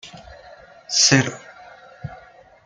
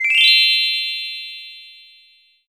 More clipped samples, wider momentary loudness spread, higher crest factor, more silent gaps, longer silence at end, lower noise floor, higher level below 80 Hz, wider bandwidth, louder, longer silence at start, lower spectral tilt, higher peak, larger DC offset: neither; first, 25 LU vs 22 LU; about the same, 22 dB vs 18 dB; neither; second, 0.5 s vs 0.8 s; second, -47 dBFS vs -54 dBFS; first, -56 dBFS vs -80 dBFS; second, 11 kHz vs over 20 kHz; second, -17 LUFS vs -13 LUFS; about the same, 0.05 s vs 0 s; first, -2.5 dB/octave vs 6 dB/octave; about the same, -2 dBFS vs 0 dBFS; neither